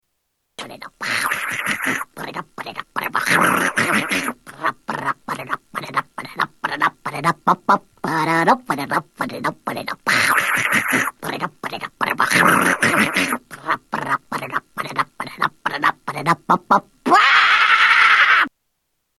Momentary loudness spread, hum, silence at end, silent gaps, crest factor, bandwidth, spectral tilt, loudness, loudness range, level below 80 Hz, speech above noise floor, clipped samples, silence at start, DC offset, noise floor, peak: 15 LU; none; 0.7 s; none; 18 dB; 13 kHz; -3 dB/octave; -18 LUFS; 8 LU; -60 dBFS; 53 dB; under 0.1%; 0.6 s; under 0.1%; -73 dBFS; 0 dBFS